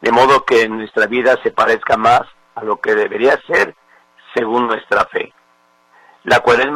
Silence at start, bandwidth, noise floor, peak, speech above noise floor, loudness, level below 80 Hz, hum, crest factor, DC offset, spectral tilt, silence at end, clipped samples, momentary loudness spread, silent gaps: 0 s; 14.5 kHz; -55 dBFS; 0 dBFS; 40 dB; -14 LUFS; -50 dBFS; 60 Hz at -60 dBFS; 14 dB; under 0.1%; -4.5 dB/octave; 0 s; under 0.1%; 12 LU; none